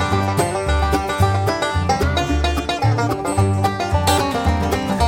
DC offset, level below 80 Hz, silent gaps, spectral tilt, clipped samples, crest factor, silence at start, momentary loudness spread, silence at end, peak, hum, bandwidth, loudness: under 0.1%; -26 dBFS; none; -5.5 dB/octave; under 0.1%; 14 dB; 0 s; 2 LU; 0 s; -4 dBFS; none; 16.5 kHz; -19 LUFS